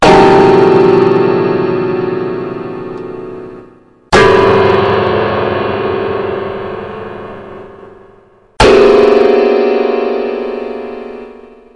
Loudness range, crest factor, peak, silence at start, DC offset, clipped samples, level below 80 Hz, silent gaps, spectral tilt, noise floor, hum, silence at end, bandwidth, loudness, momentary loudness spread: 6 LU; 12 dB; 0 dBFS; 0 s; under 0.1%; under 0.1%; -34 dBFS; none; -6 dB/octave; -44 dBFS; none; 0.4 s; 11 kHz; -10 LUFS; 20 LU